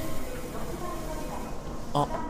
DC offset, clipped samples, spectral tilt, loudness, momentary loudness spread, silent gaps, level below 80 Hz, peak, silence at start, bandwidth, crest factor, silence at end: under 0.1%; under 0.1%; -5.5 dB/octave; -35 LUFS; 8 LU; none; -40 dBFS; -12 dBFS; 0 s; 16 kHz; 18 dB; 0 s